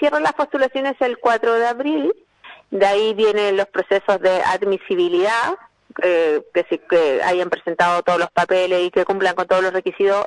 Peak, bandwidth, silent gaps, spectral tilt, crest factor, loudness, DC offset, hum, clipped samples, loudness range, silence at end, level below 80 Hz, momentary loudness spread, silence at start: -2 dBFS; 11 kHz; none; -4.5 dB/octave; 16 dB; -18 LUFS; under 0.1%; none; under 0.1%; 1 LU; 0 s; -64 dBFS; 5 LU; 0 s